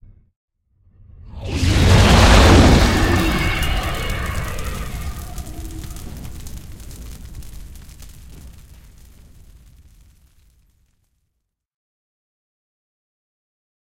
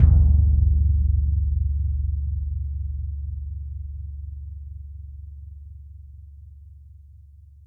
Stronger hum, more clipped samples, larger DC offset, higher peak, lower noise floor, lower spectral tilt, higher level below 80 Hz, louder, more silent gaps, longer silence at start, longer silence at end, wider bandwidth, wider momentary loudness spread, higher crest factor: neither; neither; neither; about the same, 0 dBFS vs -2 dBFS; first, -76 dBFS vs -47 dBFS; second, -5 dB/octave vs -13 dB/octave; about the same, -24 dBFS vs -24 dBFS; first, -15 LUFS vs -24 LUFS; neither; first, 1.25 s vs 0 s; first, 5.5 s vs 0.2 s; first, 17 kHz vs 0.9 kHz; about the same, 27 LU vs 25 LU; about the same, 20 dB vs 20 dB